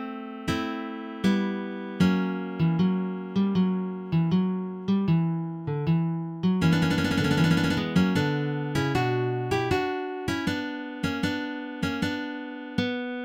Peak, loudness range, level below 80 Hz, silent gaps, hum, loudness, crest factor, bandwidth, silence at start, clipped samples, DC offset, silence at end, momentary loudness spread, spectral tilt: -8 dBFS; 4 LU; -52 dBFS; none; none; -27 LUFS; 18 dB; 15.5 kHz; 0 s; under 0.1%; under 0.1%; 0 s; 9 LU; -7 dB/octave